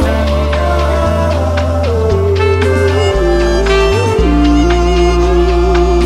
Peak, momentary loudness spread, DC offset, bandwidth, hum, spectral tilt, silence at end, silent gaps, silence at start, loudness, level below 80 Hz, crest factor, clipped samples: 0 dBFS; 3 LU; under 0.1%; 12.5 kHz; none; -6.5 dB/octave; 0 s; none; 0 s; -12 LUFS; -16 dBFS; 10 dB; under 0.1%